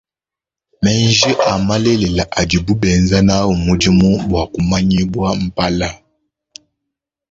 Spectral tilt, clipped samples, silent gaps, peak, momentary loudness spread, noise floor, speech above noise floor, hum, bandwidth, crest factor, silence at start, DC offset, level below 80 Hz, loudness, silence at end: -5 dB/octave; under 0.1%; none; 0 dBFS; 6 LU; -88 dBFS; 75 dB; none; 7.8 kHz; 14 dB; 0.8 s; under 0.1%; -32 dBFS; -14 LUFS; 1.35 s